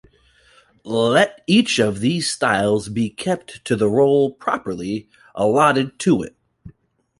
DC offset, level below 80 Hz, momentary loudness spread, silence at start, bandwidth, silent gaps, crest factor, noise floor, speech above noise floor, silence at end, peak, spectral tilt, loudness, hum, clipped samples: under 0.1%; -54 dBFS; 10 LU; 0.85 s; 11.5 kHz; none; 18 dB; -55 dBFS; 37 dB; 0.5 s; -2 dBFS; -5 dB/octave; -19 LUFS; none; under 0.1%